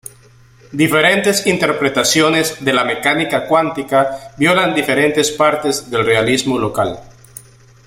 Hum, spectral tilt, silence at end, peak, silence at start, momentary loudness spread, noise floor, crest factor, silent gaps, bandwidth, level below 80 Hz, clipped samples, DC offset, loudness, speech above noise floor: none; -3.5 dB/octave; 0.8 s; 0 dBFS; 0.7 s; 6 LU; -46 dBFS; 16 dB; none; 16.5 kHz; -50 dBFS; under 0.1%; under 0.1%; -14 LUFS; 31 dB